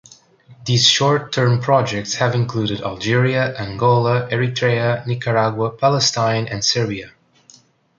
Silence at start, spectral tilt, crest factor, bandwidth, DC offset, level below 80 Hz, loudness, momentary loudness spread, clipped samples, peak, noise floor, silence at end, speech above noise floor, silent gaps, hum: 0.5 s; -4.5 dB/octave; 18 dB; 7.6 kHz; under 0.1%; -52 dBFS; -17 LUFS; 7 LU; under 0.1%; -2 dBFS; -51 dBFS; 0.9 s; 33 dB; none; none